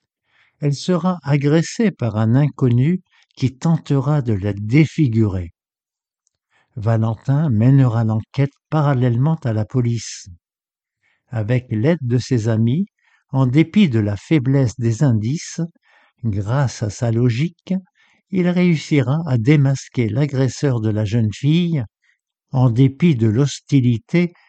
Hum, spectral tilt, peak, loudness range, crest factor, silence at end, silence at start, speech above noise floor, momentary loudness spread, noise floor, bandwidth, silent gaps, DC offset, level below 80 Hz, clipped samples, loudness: none; -7.5 dB/octave; 0 dBFS; 3 LU; 16 dB; 0.2 s; 0.6 s; over 73 dB; 10 LU; under -90 dBFS; 8.6 kHz; none; under 0.1%; -50 dBFS; under 0.1%; -18 LUFS